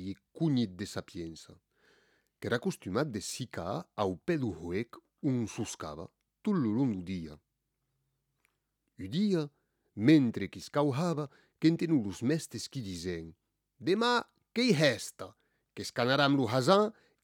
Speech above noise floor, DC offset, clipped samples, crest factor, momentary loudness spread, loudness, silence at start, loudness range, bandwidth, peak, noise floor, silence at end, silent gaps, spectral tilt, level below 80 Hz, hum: 51 dB; under 0.1%; under 0.1%; 22 dB; 17 LU; -32 LUFS; 0 s; 7 LU; 17 kHz; -10 dBFS; -82 dBFS; 0.35 s; none; -5.5 dB/octave; -66 dBFS; none